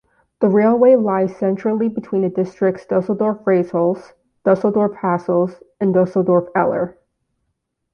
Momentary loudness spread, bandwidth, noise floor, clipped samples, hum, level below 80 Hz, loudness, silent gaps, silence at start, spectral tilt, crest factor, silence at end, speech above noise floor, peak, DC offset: 8 LU; 6.6 kHz; -73 dBFS; under 0.1%; none; -60 dBFS; -18 LUFS; none; 0.4 s; -10 dB/octave; 16 dB; 1.05 s; 56 dB; -2 dBFS; under 0.1%